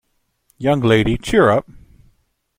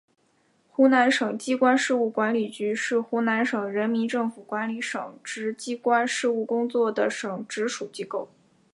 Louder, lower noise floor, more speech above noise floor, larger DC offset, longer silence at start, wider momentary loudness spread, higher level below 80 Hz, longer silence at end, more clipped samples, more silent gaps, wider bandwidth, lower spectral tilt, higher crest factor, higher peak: first, -16 LUFS vs -25 LUFS; about the same, -63 dBFS vs -66 dBFS; first, 48 dB vs 41 dB; neither; second, 0.6 s vs 0.8 s; second, 7 LU vs 12 LU; first, -38 dBFS vs -82 dBFS; first, 0.95 s vs 0.5 s; neither; neither; first, 16.5 kHz vs 11.5 kHz; first, -6.5 dB/octave vs -4 dB/octave; about the same, 18 dB vs 18 dB; first, -2 dBFS vs -8 dBFS